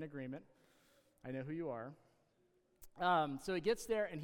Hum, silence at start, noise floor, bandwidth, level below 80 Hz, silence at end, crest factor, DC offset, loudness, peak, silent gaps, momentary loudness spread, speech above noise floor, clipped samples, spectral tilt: none; 0 s; -76 dBFS; 17.5 kHz; -70 dBFS; 0 s; 18 dB; under 0.1%; -40 LUFS; -22 dBFS; none; 16 LU; 36 dB; under 0.1%; -5.5 dB/octave